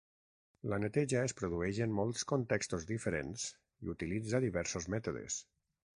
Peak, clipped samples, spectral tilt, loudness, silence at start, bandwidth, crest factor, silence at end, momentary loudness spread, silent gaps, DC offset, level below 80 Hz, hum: -18 dBFS; under 0.1%; -5 dB/octave; -37 LUFS; 0.65 s; 10.5 kHz; 20 dB; 0.55 s; 8 LU; none; under 0.1%; -58 dBFS; none